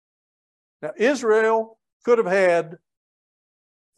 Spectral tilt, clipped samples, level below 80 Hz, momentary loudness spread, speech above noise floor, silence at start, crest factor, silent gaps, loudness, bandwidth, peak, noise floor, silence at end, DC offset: -5 dB/octave; under 0.1%; -76 dBFS; 17 LU; over 70 dB; 0.8 s; 16 dB; 1.93-2.00 s; -20 LUFS; 11 kHz; -6 dBFS; under -90 dBFS; 1.25 s; under 0.1%